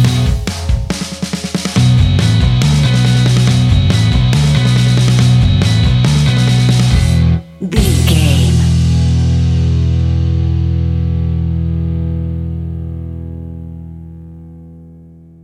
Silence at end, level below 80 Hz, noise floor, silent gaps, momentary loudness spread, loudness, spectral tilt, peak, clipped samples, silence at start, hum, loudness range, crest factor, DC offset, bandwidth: 0.45 s; -20 dBFS; -38 dBFS; none; 13 LU; -12 LUFS; -6 dB/octave; 0 dBFS; under 0.1%; 0 s; none; 9 LU; 12 dB; under 0.1%; 13.5 kHz